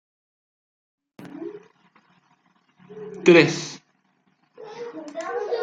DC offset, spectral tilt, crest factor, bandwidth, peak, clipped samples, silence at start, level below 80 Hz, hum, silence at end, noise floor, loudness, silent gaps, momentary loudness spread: under 0.1%; -5 dB/octave; 24 dB; 7.8 kHz; -2 dBFS; under 0.1%; 1.2 s; -68 dBFS; none; 0 s; -67 dBFS; -20 LUFS; none; 26 LU